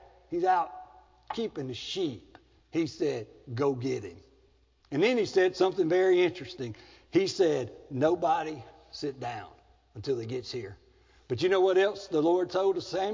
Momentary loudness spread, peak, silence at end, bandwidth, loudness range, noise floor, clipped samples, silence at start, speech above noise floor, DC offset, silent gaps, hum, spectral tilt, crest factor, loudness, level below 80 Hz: 15 LU; -12 dBFS; 0 s; 7.6 kHz; 7 LU; -65 dBFS; under 0.1%; 0.3 s; 36 dB; under 0.1%; none; none; -5.5 dB/octave; 16 dB; -29 LUFS; -64 dBFS